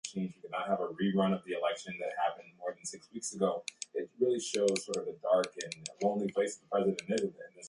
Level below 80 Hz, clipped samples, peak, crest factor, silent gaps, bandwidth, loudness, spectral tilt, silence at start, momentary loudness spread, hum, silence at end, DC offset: -76 dBFS; under 0.1%; -16 dBFS; 18 dB; none; 11.5 kHz; -34 LUFS; -4.5 dB/octave; 0.05 s; 10 LU; none; 0 s; under 0.1%